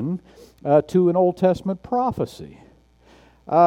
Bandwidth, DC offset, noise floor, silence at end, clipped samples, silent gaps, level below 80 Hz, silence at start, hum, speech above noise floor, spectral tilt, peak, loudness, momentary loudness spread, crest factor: 12 kHz; under 0.1%; -53 dBFS; 0 s; under 0.1%; none; -54 dBFS; 0 s; none; 33 dB; -8.5 dB/octave; -4 dBFS; -21 LUFS; 15 LU; 18 dB